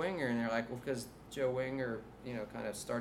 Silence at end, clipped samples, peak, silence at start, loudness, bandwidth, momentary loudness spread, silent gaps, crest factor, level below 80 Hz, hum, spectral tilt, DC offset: 0 s; under 0.1%; -20 dBFS; 0 s; -39 LUFS; 16 kHz; 9 LU; none; 18 dB; -64 dBFS; none; -5.5 dB/octave; under 0.1%